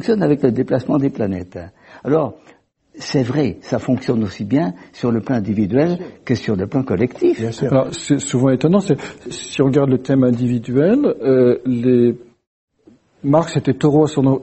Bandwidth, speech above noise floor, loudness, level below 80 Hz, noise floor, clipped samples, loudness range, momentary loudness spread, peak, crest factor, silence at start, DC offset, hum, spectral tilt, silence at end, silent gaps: 8.4 kHz; 35 dB; -17 LUFS; -50 dBFS; -51 dBFS; under 0.1%; 5 LU; 9 LU; 0 dBFS; 16 dB; 0 s; under 0.1%; none; -7 dB/octave; 0 s; 12.47-12.68 s